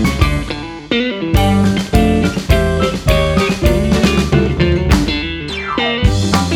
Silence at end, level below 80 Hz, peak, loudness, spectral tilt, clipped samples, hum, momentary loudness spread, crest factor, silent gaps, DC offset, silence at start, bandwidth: 0 s; -20 dBFS; 0 dBFS; -14 LUFS; -6 dB/octave; under 0.1%; none; 6 LU; 14 dB; none; under 0.1%; 0 s; 18 kHz